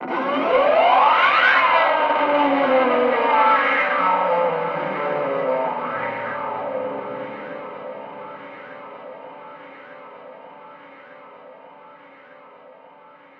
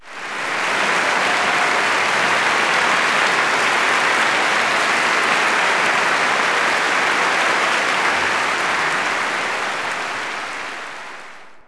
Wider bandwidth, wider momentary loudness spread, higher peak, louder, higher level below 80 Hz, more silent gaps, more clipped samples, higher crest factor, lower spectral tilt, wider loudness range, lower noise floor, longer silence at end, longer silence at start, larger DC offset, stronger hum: second, 6.6 kHz vs 11 kHz; first, 24 LU vs 9 LU; about the same, -4 dBFS vs -4 dBFS; about the same, -18 LUFS vs -17 LUFS; second, -66 dBFS vs -60 dBFS; neither; neither; about the same, 18 dB vs 14 dB; first, -6 dB/octave vs -1 dB/octave; first, 23 LU vs 4 LU; first, -47 dBFS vs -40 dBFS; first, 1.45 s vs 0.05 s; about the same, 0 s vs 0 s; neither; neither